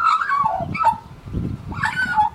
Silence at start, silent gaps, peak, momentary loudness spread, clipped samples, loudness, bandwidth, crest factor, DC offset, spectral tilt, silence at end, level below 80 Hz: 0 s; none; -6 dBFS; 11 LU; under 0.1%; -21 LUFS; 13 kHz; 14 dB; under 0.1%; -5.5 dB/octave; 0 s; -40 dBFS